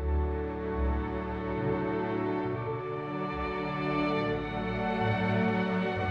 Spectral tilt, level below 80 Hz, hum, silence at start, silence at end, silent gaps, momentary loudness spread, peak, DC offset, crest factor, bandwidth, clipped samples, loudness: -8.5 dB/octave; -40 dBFS; none; 0 s; 0 s; none; 6 LU; -16 dBFS; under 0.1%; 14 dB; 6.8 kHz; under 0.1%; -31 LUFS